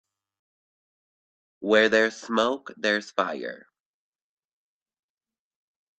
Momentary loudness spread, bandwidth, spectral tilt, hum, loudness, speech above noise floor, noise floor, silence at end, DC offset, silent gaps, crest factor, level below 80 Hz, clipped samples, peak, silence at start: 15 LU; 8.8 kHz; -3.5 dB/octave; none; -24 LUFS; over 66 dB; under -90 dBFS; 2.4 s; under 0.1%; none; 24 dB; -72 dBFS; under 0.1%; -6 dBFS; 1.6 s